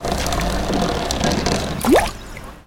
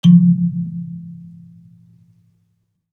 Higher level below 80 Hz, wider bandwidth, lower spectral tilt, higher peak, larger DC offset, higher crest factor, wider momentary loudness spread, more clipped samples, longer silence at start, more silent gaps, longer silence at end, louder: first, -28 dBFS vs -70 dBFS; first, 17 kHz vs 6.4 kHz; second, -4.5 dB/octave vs -9 dB/octave; about the same, -2 dBFS vs -2 dBFS; neither; about the same, 18 dB vs 16 dB; second, 9 LU vs 27 LU; neither; about the same, 0 s vs 0.05 s; neither; second, 0.05 s vs 1.8 s; second, -19 LUFS vs -16 LUFS